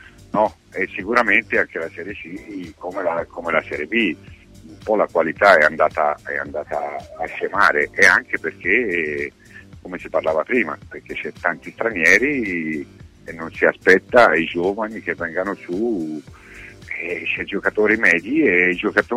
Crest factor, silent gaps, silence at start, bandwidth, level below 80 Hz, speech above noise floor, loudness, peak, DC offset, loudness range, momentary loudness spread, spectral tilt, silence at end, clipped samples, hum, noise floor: 20 dB; none; 0.35 s; 15.5 kHz; -52 dBFS; 21 dB; -18 LUFS; 0 dBFS; under 0.1%; 6 LU; 18 LU; -4.5 dB/octave; 0 s; under 0.1%; none; -40 dBFS